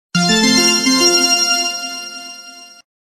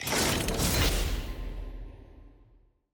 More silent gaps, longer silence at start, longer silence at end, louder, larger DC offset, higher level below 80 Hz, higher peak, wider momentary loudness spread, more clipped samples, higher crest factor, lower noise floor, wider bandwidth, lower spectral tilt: neither; first, 0.15 s vs 0 s; second, 0.45 s vs 0.65 s; first, -12 LUFS vs -28 LUFS; neither; second, -54 dBFS vs -36 dBFS; first, 0 dBFS vs -16 dBFS; about the same, 19 LU vs 19 LU; neither; about the same, 16 dB vs 16 dB; second, -37 dBFS vs -62 dBFS; second, 16.5 kHz vs over 20 kHz; second, -2 dB/octave vs -3.5 dB/octave